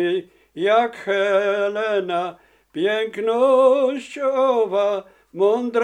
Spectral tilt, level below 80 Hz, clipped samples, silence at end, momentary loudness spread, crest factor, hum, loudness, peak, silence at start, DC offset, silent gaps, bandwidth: -5 dB/octave; -68 dBFS; under 0.1%; 0 s; 11 LU; 14 dB; none; -20 LUFS; -4 dBFS; 0 s; under 0.1%; none; 9.6 kHz